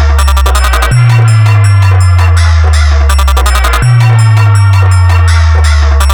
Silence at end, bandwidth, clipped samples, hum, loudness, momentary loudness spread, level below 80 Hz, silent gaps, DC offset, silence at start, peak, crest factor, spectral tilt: 0 s; 19 kHz; under 0.1%; none; -7 LUFS; 2 LU; -10 dBFS; none; under 0.1%; 0 s; 0 dBFS; 4 dB; -5 dB/octave